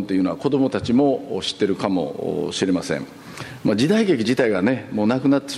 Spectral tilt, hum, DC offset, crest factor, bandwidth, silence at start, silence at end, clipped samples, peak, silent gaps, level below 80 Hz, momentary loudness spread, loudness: -6 dB/octave; none; under 0.1%; 16 dB; 12.5 kHz; 0 s; 0 s; under 0.1%; -4 dBFS; none; -56 dBFS; 8 LU; -21 LUFS